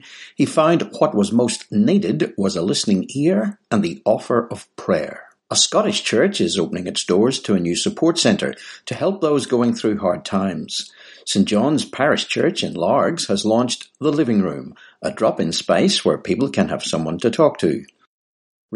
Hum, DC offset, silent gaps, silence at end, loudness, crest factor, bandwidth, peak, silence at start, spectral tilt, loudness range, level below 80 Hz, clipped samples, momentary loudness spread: none; under 0.1%; 18.07-18.69 s; 0 s; -19 LUFS; 18 dB; 11.5 kHz; -2 dBFS; 0.05 s; -4.5 dB/octave; 2 LU; -60 dBFS; under 0.1%; 9 LU